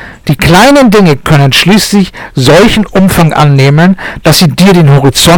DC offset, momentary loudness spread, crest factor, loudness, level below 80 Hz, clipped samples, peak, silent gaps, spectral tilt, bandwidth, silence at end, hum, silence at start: under 0.1%; 7 LU; 4 dB; -5 LUFS; -26 dBFS; 3%; 0 dBFS; none; -5 dB/octave; 19 kHz; 0 s; none; 0 s